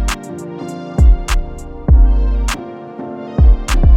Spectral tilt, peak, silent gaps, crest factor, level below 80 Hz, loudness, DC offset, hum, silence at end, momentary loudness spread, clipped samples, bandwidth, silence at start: -6 dB/octave; 0 dBFS; none; 12 dB; -14 dBFS; -16 LUFS; under 0.1%; none; 0 s; 15 LU; under 0.1%; 12.5 kHz; 0 s